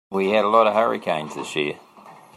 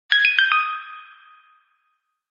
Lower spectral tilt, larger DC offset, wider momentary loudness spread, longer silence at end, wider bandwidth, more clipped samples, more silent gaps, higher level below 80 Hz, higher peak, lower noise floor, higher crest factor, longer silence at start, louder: first, -5 dB/octave vs 18 dB/octave; neither; second, 11 LU vs 24 LU; second, 0.2 s vs 1.25 s; first, 13.5 kHz vs 7.2 kHz; neither; neither; first, -70 dBFS vs under -90 dBFS; about the same, -4 dBFS vs -2 dBFS; second, -46 dBFS vs -72 dBFS; about the same, 18 dB vs 22 dB; about the same, 0.1 s vs 0.1 s; second, -21 LUFS vs -17 LUFS